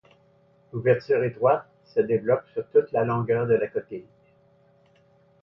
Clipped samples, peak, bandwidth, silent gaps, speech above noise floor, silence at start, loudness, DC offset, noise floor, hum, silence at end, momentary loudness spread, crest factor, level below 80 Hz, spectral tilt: under 0.1%; -8 dBFS; 5.8 kHz; none; 37 dB; 0.75 s; -24 LUFS; under 0.1%; -60 dBFS; none; 1.4 s; 10 LU; 18 dB; -64 dBFS; -10 dB/octave